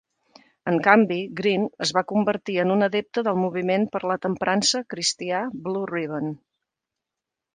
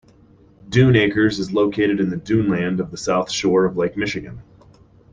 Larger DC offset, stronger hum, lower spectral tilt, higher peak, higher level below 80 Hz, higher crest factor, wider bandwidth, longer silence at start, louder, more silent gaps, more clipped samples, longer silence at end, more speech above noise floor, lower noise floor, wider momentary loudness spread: neither; neither; second, -4 dB/octave vs -6 dB/octave; about the same, 0 dBFS vs -2 dBFS; second, -68 dBFS vs -48 dBFS; first, 24 dB vs 18 dB; about the same, 10 kHz vs 9.8 kHz; about the same, 0.65 s vs 0.65 s; second, -23 LUFS vs -19 LUFS; neither; neither; first, 1.2 s vs 0.7 s; first, 63 dB vs 32 dB; first, -86 dBFS vs -51 dBFS; about the same, 10 LU vs 9 LU